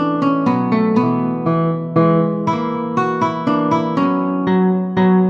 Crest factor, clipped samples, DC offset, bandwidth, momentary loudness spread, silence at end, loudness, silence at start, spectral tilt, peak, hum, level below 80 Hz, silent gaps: 14 dB; under 0.1%; under 0.1%; 6.8 kHz; 4 LU; 0 s; -17 LUFS; 0 s; -9 dB/octave; -2 dBFS; none; -58 dBFS; none